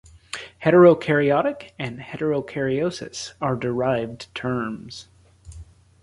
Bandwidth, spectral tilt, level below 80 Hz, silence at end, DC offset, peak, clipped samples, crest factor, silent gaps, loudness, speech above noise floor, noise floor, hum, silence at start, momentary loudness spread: 11.5 kHz; -6.5 dB/octave; -52 dBFS; 0.4 s; under 0.1%; -4 dBFS; under 0.1%; 20 dB; none; -22 LUFS; 23 dB; -44 dBFS; none; 0.35 s; 20 LU